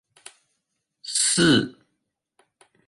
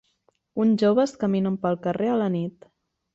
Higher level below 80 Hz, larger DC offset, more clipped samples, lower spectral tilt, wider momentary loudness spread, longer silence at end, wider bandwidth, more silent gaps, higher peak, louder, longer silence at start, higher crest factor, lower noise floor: first, -60 dBFS vs -66 dBFS; neither; neither; second, -3 dB/octave vs -7.5 dB/octave; first, 18 LU vs 9 LU; first, 1.15 s vs 0.65 s; first, 11.5 kHz vs 7.8 kHz; neither; first, -6 dBFS vs -10 dBFS; first, -20 LUFS vs -23 LUFS; first, 1.05 s vs 0.55 s; about the same, 20 dB vs 16 dB; first, -78 dBFS vs -68 dBFS